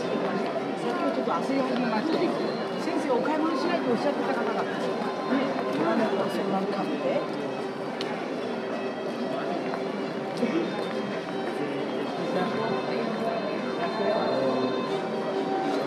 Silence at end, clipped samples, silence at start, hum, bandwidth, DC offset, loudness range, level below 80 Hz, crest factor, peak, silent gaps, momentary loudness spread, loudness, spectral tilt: 0 s; under 0.1%; 0 s; none; 13 kHz; under 0.1%; 4 LU; -78 dBFS; 14 dB; -14 dBFS; none; 5 LU; -28 LUFS; -6 dB/octave